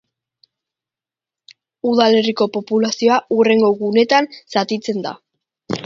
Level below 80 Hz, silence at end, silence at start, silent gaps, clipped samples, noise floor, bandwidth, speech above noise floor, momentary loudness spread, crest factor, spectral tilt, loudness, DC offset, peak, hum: -66 dBFS; 0 s; 1.85 s; none; under 0.1%; -89 dBFS; 7.6 kHz; 73 dB; 10 LU; 18 dB; -4.5 dB/octave; -16 LUFS; under 0.1%; 0 dBFS; none